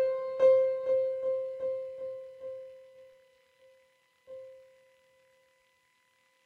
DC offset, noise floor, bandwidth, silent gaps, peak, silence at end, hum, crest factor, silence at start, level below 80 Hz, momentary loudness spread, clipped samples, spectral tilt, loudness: under 0.1%; -71 dBFS; 4.5 kHz; none; -14 dBFS; 1.85 s; none; 18 dB; 0 s; -82 dBFS; 26 LU; under 0.1%; -5 dB/octave; -30 LUFS